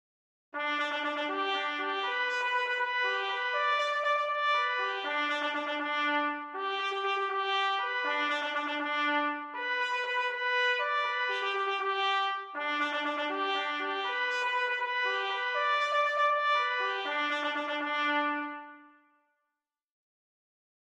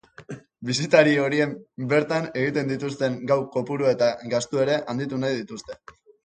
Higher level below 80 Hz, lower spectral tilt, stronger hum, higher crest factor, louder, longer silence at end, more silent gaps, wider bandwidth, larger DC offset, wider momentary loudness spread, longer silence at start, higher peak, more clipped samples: second, -88 dBFS vs -64 dBFS; second, -0.5 dB/octave vs -5.5 dB/octave; neither; second, 14 dB vs 22 dB; second, -30 LUFS vs -23 LUFS; first, 2.1 s vs 0.5 s; neither; first, 10.5 kHz vs 9.4 kHz; neither; second, 5 LU vs 18 LU; first, 0.55 s vs 0.2 s; second, -18 dBFS vs -2 dBFS; neither